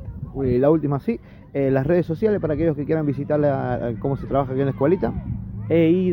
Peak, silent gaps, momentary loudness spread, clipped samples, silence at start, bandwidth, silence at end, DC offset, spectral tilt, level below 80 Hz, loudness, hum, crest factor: -6 dBFS; none; 10 LU; under 0.1%; 0 s; 16 kHz; 0 s; under 0.1%; -11 dB/octave; -40 dBFS; -22 LUFS; none; 16 dB